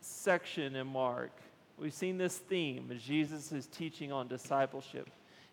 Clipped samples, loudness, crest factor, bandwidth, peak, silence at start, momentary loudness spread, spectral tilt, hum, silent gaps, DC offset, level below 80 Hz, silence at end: under 0.1%; -38 LUFS; 22 dB; 19 kHz; -16 dBFS; 0 s; 11 LU; -4.5 dB/octave; none; none; under 0.1%; -86 dBFS; 0.05 s